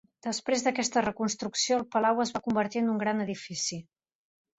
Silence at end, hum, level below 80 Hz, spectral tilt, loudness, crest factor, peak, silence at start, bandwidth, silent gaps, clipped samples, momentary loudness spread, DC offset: 0.75 s; none; -68 dBFS; -3.5 dB/octave; -29 LUFS; 16 dB; -14 dBFS; 0.25 s; 8.4 kHz; none; under 0.1%; 7 LU; under 0.1%